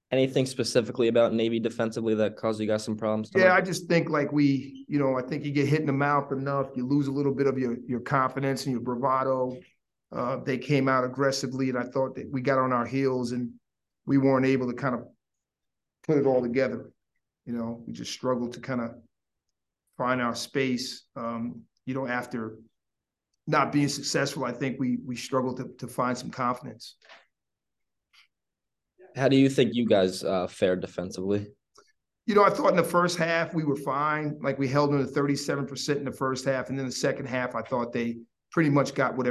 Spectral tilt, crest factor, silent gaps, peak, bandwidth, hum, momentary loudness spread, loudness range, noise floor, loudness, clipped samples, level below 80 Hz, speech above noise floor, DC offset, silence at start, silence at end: -5.5 dB/octave; 20 dB; none; -6 dBFS; 12.5 kHz; none; 11 LU; 7 LU; -87 dBFS; -27 LUFS; under 0.1%; -64 dBFS; 61 dB; under 0.1%; 0.1 s; 0 s